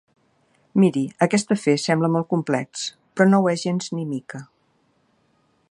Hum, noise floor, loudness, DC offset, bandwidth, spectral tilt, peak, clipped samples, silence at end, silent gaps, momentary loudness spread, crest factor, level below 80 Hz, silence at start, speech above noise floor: none; -65 dBFS; -21 LUFS; under 0.1%; 11 kHz; -6 dB/octave; -2 dBFS; under 0.1%; 1.3 s; none; 12 LU; 20 dB; -70 dBFS; 0.75 s; 44 dB